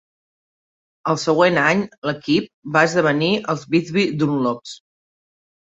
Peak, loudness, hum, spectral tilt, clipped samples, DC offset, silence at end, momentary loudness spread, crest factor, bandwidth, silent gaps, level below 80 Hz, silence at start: -2 dBFS; -19 LUFS; none; -5.5 dB/octave; under 0.1%; under 0.1%; 1 s; 10 LU; 18 dB; 8 kHz; 1.98-2.02 s, 2.53-2.62 s; -62 dBFS; 1.05 s